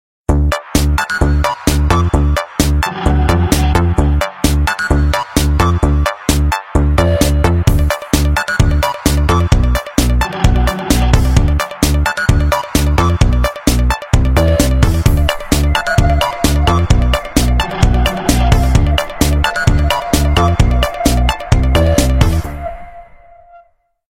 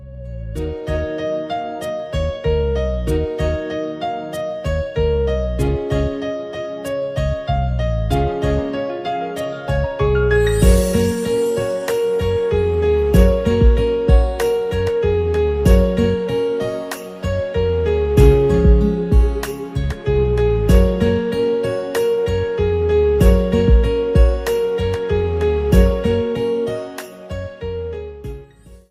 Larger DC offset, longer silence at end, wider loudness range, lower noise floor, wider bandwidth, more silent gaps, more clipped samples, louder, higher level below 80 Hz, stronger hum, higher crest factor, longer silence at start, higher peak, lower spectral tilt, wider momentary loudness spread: neither; first, 1.05 s vs 0.15 s; second, 1 LU vs 5 LU; first, -50 dBFS vs -42 dBFS; about the same, 16.5 kHz vs 15.5 kHz; neither; neither; first, -14 LUFS vs -18 LUFS; first, -16 dBFS vs -22 dBFS; neither; about the same, 12 dB vs 16 dB; first, 0.3 s vs 0 s; about the same, 0 dBFS vs 0 dBFS; second, -5.5 dB/octave vs -7 dB/octave; second, 3 LU vs 11 LU